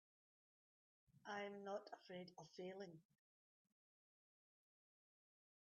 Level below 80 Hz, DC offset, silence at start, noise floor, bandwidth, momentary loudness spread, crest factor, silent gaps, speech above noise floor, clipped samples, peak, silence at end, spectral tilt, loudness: under -90 dBFS; under 0.1%; 1.1 s; under -90 dBFS; 7 kHz; 9 LU; 20 dB; none; over 35 dB; under 0.1%; -38 dBFS; 2.7 s; -3.5 dB/octave; -55 LUFS